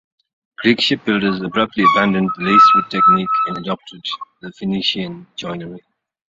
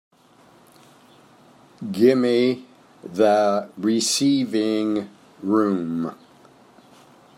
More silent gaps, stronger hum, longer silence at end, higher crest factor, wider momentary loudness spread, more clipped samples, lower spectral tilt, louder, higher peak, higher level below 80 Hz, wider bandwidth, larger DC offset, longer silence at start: neither; neither; second, 0.5 s vs 1.25 s; about the same, 16 dB vs 18 dB; about the same, 17 LU vs 15 LU; neither; about the same, -5.5 dB/octave vs -4.5 dB/octave; first, -15 LUFS vs -21 LUFS; about the same, -2 dBFS vs -4 dBFS; first, -56 dBFS vs -74 dBFS; second, 7.8 kHz vs 16 kHz; neither; second, 0.6 s vs 1.8 s